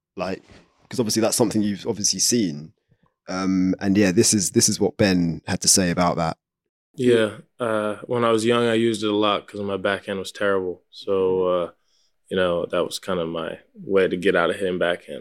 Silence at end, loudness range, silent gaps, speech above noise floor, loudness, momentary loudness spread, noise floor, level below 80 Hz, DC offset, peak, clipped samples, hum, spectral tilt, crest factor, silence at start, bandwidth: 0 s; 5 LU; 6.69-6.94 s; 46 dB; -21 LUFS; 13 LU; -67 dBFS; -60 dBFS; under 0.1%; -4 dBFS; under 0.1%; none; -4 dB/octave; 20 dB; 0.15 s; 16.5 kHz